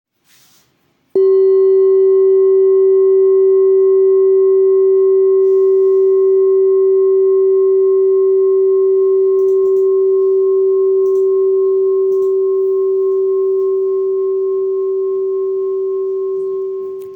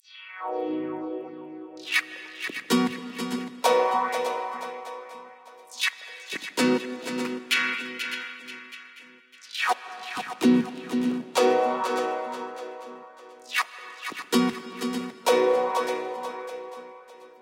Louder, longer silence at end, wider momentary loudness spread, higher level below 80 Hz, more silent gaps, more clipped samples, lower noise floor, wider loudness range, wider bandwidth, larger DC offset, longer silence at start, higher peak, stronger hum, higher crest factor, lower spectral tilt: first, -12 LUFS vs -27 LUFS; about the same, 0 s vs 0.1 s; second, 7 LU vs 19 LU; first, -74 dBFS vs -80 dBFS; neither; neither; first, -59 dBFS vs -51 dBFS; about the same, 5 LU vs 4 LU; second, 2.1 kHz vs 17 kHz; neither; first, 1.15 s vs 0.1 s; about the same, -6 dBFS vs -8 dBFS; neither; second, 6 dB vs 20 dB; first, -8.5 dB/octave vs -3.5 dB/octave